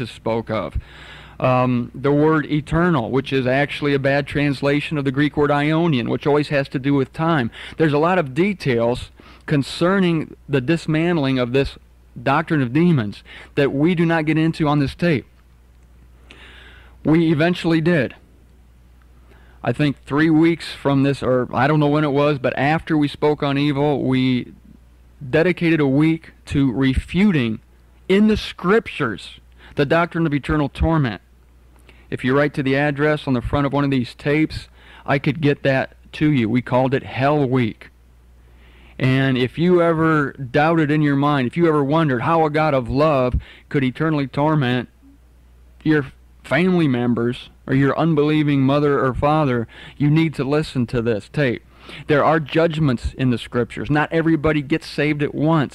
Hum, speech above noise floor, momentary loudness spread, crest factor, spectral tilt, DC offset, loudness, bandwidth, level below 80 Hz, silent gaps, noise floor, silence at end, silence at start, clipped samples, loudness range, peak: none; 31 dB; 8 LU; 10 dB; -7.5 dB/octave; under 0.1%; -19 LUFS; 11.5 kHz; -40 dBFS; none; -49 dBFS; 0.05 s; 0 s; under 0.1%; 3 LU; -8 dBFS